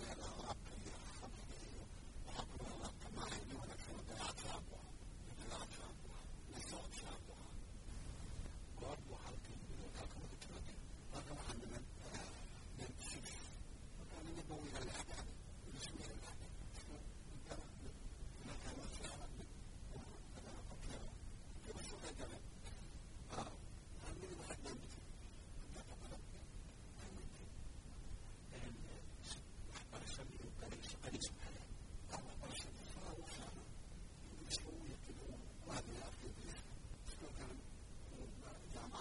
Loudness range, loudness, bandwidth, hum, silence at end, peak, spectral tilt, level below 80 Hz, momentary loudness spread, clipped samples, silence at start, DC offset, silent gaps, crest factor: 4 LU; -53 LUFS; 11.5 kHz; none; 0 s; -28 dBFS; -4 dB/octave; -54 dBFS; 8 LU; under 0.1%; 0 s; under 0.1%; none; 24 dB